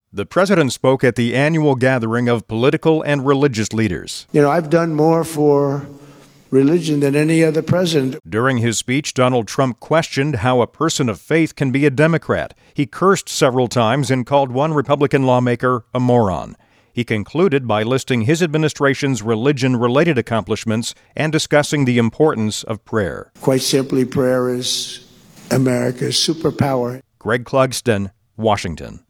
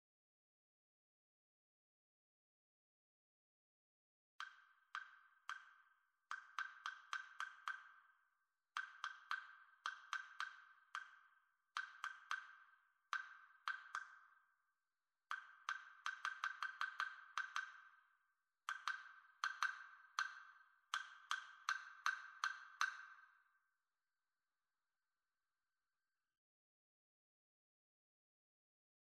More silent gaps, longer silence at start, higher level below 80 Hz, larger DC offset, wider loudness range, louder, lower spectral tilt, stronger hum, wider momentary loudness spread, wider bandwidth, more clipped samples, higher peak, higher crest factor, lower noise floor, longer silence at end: neither; second, 0.15 s vs 4.4 s; first, -50 dBFS vs under -90 dBFS; neither; second, 2 LU vs 10 LU; first, -17 LUFS vs -49 LUFS; first, -5.5 dB/octave vs 4.5 dB/octave; neither; second, 7 LU vs 16 LU; first, 17 kHz vs 12 kHz; neither; first, 0 dBFS vs -22 dBFS; second, 16 dB vs 32 dB; second, -44 dBFS vs under -90 dBFS; second, 0.1 s vs 5.85 s